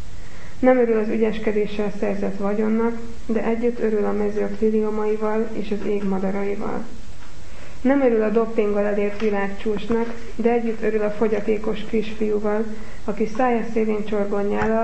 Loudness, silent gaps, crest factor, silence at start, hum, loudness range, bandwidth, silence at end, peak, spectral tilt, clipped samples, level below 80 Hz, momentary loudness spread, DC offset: -22 LUFS; none; 20 dB; 0 s; none; 2 LU; 8.6 kHz; 0 s; -4 dBFS; -7.5 dB/octave; under 0.1%; -42 dBFS; 10 LU; 6%